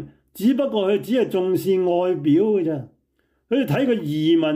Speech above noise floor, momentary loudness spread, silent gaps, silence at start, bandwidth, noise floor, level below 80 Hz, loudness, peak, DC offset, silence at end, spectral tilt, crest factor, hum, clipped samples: 49 dB; 5 LU; none; 0 s; 16 kHz; -68 dBFS; -64 dBFS; -21 LUFS; -8 dBFS; under 0.1%; 0 s; -7 dB/octave; 12 dB; none; under 0.1%